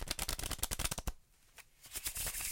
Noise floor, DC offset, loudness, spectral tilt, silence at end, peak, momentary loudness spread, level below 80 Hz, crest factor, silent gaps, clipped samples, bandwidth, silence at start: -62 dBFS; under 0.1%; -39 LUFS; -1.5 dB/octave; 0 s; -10 dBFS; 19 LU; -48 dBFS; 30 dB; none; under 0.1%; 17 kHz; 0 s